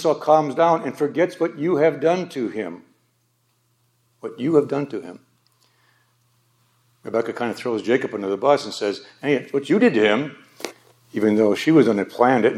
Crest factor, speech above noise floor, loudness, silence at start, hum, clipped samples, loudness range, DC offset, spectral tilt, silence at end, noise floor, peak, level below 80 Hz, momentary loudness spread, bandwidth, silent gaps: 20 dB; 47 dB; -20 LUFS; 0 s; none; under 0.1%; 8 LU; under 0.1%; -6 dB/octave; 0 s; -66 dBFS; -2 dBFS; -76 dBFS; 16 LU; 13.5 kHz; none